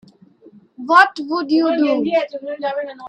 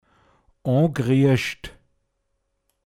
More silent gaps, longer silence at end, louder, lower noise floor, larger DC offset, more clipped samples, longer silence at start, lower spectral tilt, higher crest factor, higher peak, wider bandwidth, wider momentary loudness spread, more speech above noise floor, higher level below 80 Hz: neither; second, 0 s vs 1.15 s; first, -17 LUFS vs -21 LUFS; second, -48 dBFS vs -73 dBFS; neither; neither; first, 0.8 s vs 0.65 s; second, -4.5 dB/octave vs -7 dB/octave; about the same, 18 dB vs 18 dB; first, 0 dBFS vs -6 dBFS; second, 10.5 kHz vs 14 kHz; second, 13 LU vs 17 LU; second, 31 dB vs 54 dB; second, -68 dBFS vs -54 dBFS